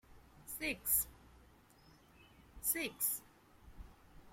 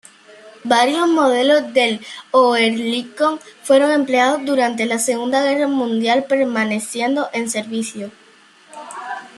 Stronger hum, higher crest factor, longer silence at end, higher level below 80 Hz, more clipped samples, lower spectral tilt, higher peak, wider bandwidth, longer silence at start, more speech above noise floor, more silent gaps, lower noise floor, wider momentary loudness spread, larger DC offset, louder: neither; first, 24 dB vs 16 dB; about the same, 0.05 s vs 0.1 s; first, -62 dBFS vs -70 dBFS; neither; second, -1 dB/octave vs -3 dB/octave; second, -20 dBFS vs -2 dBFS; first, 16.5 kHz vs 13 kHz; second, 0.1 s vs 0.45 s; second, 27 dB vs 32 dB; neither; first, -65 dBFS vs -49 dBFS; first, 26 LU vs 15 LU; neither; second, -37 LUFS vs -17 LUFS